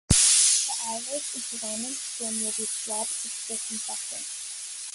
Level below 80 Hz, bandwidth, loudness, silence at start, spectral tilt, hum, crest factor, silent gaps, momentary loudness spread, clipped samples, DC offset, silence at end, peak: -46 dBFS; 12 kHz; -25 LUFS; 0.1 s; -1 dB/octave; none; 24 dB; none; 15 LU; under 0.1%; under 0.1%; 0 s; -4 dBFS